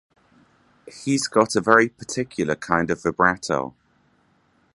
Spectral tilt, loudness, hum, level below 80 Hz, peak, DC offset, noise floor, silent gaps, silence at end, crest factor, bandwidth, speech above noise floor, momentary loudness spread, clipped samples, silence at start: -4.5 dB/octave; -21 LUFS; none; -54 dBFS; 0 dBFS; under 0.1%; -63 dBFS; none; 1.05 s; 24 dB; 11.5 kHz; 41 dB; 11 LU; under 0.1%; 0.85 s